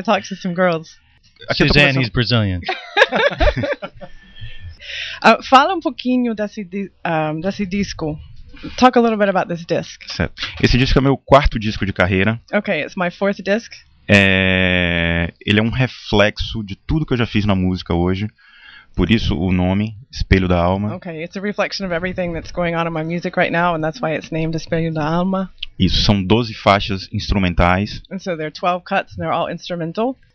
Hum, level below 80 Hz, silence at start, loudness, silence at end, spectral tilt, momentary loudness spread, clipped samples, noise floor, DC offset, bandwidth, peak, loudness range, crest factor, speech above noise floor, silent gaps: none; -30 dBFS; 0 s; -18 LUFS; 0.2 s; -6 dB/octave; 12 LU; under 0.1%; -43 dBFS; under 0.1%; 8.4 kHz; 0 dBFS; 4 LU; 18 dB; 26 dB; none